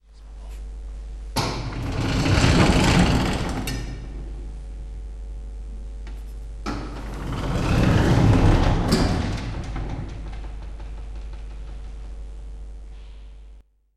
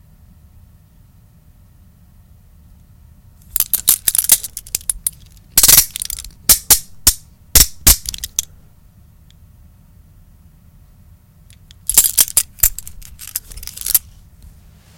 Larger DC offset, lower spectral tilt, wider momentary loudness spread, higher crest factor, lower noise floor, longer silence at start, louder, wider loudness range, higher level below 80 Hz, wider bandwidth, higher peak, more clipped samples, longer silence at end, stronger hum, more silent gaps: neither; first, -6 dB/octave vs 0 dB/octave; first, 21 LU vs 17 LU; about the same, 20 dB vs 20 dB; about the same, -48 dBFS vs -47 dBFS; second, 0.1 s vs 3.55 s; second, -22 LUFS vs -13 LUFS; first, 15 LU vs 9 LU; about the same, -30 dBFS vs -32 dBFS; second, 14.5 kHz vs over 20 kHz; second, -4 dBFS vs 0 dBFS; second, under 0.1% vs 0.3%; second, 0.35 s vs 1 s; neither; neither